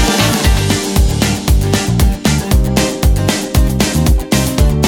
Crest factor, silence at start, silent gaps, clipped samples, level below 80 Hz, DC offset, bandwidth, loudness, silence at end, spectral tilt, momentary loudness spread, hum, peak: 12 dB; 0 s; none; under 0.1%; -16 dBFS; under 0.1%; 18.5 kHz; -13 LUFS; 0 s; -4.5 dB/octave; 2 LU; none; 0 dBFS